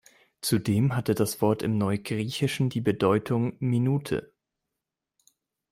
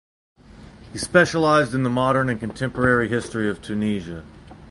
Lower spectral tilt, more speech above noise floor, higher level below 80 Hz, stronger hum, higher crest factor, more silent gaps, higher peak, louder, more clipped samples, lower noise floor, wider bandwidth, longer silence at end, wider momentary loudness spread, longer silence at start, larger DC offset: about the same, -6 dB/octave vs -5.5 dB/octave; first, 61 dB vs 23 dB; second, -60 dBFS vs -46 dBFS; neither; about the same, 18 dB vs 20 dB; neither; second, -10 dBFS vs -2 dBFS; second, -26 LUFS vs -21 LUFS; neither; first, -86 dBFS vs -44 dBFS; first, 16 kHz vs 11.5 kHz; first, 1.45 s vs 0.05 s; second, 5 LU vs 13 LU; second, 0.45 s vs 0.6 s; neither